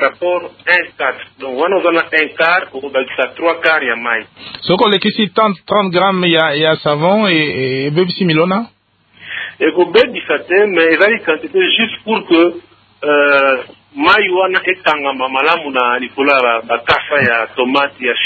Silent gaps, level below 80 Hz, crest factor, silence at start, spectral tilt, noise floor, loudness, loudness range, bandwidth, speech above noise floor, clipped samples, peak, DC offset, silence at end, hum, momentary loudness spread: none; -54 dBFS; 14 dB; 0 s; -7 dB/octave; -46 dBFS; -13 LUFS; 2 LU; 8 kHz; 32 dB; under 0.1%; 0 dBFS; under 0.1%; 0 s; none; 8 LU